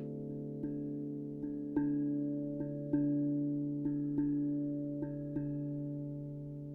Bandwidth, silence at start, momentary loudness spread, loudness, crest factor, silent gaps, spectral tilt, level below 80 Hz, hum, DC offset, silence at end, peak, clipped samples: 2 kHz; 0 s; 8 LU; -37 LUFS; 14 dB; none; -12.5 dB/octave; -64 dBFS; none; under 0.1%; 0 s; -22 dBFS; under 0.1%